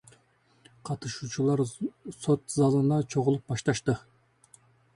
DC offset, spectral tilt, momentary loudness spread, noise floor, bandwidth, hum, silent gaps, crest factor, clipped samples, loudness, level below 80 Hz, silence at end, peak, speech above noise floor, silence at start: under 0.1%; -6.5 dB/octave; 12 LU; -65 dBFS; 11.5 kHz; none; none; 18 dB; under 0.1%; -28 LUFS; -62 dBFS; 0.95 s; -10 dBFS; 38 dB; 0.85 s